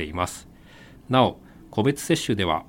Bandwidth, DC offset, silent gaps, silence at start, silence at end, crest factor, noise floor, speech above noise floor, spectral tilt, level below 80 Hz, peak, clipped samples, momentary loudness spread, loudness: 17 kHz; under 0.1%; none; 0 s; 0.05 s; 20 dB; -48 dBFS; 25 dB; -5 dB/octave; -50 dBFS; -4 dBFS; under 0.1%; 9 LU; -24 LUFS